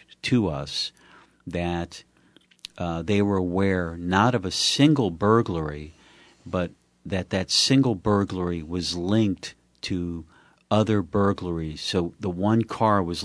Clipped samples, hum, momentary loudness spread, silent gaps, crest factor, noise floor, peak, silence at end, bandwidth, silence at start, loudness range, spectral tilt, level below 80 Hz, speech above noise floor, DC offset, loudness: under 0.1%; none; 14 LU; none; 20 dB; -59 dBFS; -4 dBFS; 0 s; 11 kHz; 0.25 s; 5 LU; -5 dB/octave; -50 dBFS; 35 dB; under 0.1%; -24 LUFS